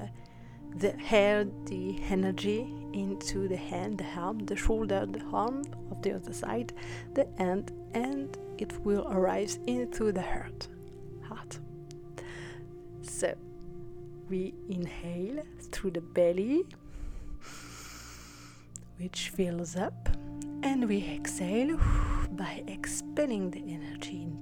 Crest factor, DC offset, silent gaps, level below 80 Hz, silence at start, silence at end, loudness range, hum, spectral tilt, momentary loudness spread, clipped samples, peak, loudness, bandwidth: 22 dB; under 0.1%; none; -42 dBFS; 0 s; 0 s; 8 LU; none; -5.5 dB/octave; 17 LU; under 0.1%; -12 dBFS; -33 LUFS; 18 kHz